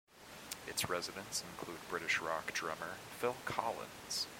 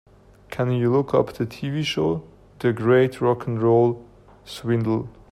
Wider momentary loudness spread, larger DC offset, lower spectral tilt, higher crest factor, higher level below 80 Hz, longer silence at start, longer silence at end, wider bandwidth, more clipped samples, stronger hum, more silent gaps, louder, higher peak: about the same, 11 LU vs 12 LU; neither; second, -2 dB/octave vs -7.5 dB/octave; first, 22 dB vs 16 dB; second, -70 dBFS vs -54 dBFS; second, 0.1 s vs 0.5 s; second, 0 s vs 0.2 s; first, 16.5 kHz vs 13.5 kHz; neither; second, none vs 50 Hz at -55 dBFS; neither; second, -40 LUFS vs -22 LUFS; second, -18 dBFS vs -6 dBFS